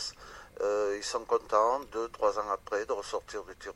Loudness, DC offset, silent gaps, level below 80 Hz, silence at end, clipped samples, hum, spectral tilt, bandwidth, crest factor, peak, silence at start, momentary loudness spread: -31 LUFS; under 0.1%; none; -60 dBFS; 0.05 s; under 0.1%; none; -2.5 dB/octave; 15 kHz; 20 dB; -12 dBFS; 0 s; 13 LU